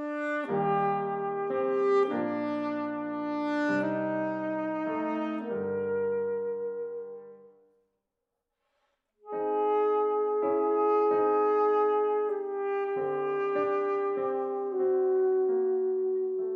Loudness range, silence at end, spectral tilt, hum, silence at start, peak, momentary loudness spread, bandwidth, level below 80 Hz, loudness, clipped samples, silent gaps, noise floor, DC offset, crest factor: 8 LU; 0 s; -8 dB/octave; none; 0 s; -16 dBFS; 8 LU; 5.6 kHz; -86 dBFS; -29 LUFS; under 0.1%; none; -84 dBFS; under 0.1%; 14 dB